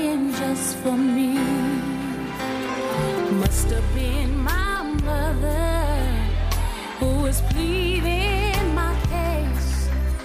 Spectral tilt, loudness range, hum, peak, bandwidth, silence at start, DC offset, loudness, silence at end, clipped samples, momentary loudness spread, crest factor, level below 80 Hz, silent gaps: -5.5 dB/octave; 1 LU; none; -6 dBFS; 15.5 kHz; 0 s; under 0.1%; -23 LUFS; 0 s; under 0.1%; 5 LU; 14 dB; -24 dBFS; none